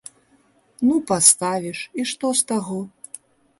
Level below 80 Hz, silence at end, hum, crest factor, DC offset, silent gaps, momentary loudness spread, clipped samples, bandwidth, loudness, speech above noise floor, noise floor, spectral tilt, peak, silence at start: -64 dBFS; 0.7 s; none; 22 dB; under 0.1%; none; 23 LU; under 0.1%; 12 kHz; -19 LUFS; 39 dB; -59 dBFS; -2.5 dB/octave; 0 dBFS; 0.8 s